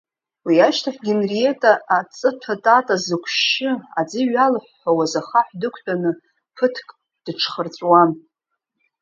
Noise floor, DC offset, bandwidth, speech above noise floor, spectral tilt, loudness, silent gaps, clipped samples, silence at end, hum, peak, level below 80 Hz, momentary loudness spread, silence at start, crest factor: -78 dBFS; under 0.1%; 7.6 kHz; 60 dB; -4.5 dB/octave; -19 LUFS; none; under 0.1%; 0.85 s; none; 0 dBFS; -72 dBFS; 9 LU; 0.45 s; 20 dB